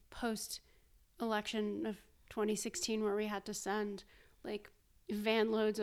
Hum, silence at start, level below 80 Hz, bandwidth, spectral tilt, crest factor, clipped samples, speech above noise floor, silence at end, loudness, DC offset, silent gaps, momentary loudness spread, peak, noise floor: none; 0.1 s; -66 dBFS; 16 kHz; -3.5 dB/octave; 18 dB; under 0.1%; 30 dB; 0 s; -38 LUFS; under 0.1%; none; 14 LU; -22 dBFS; -67 dBFS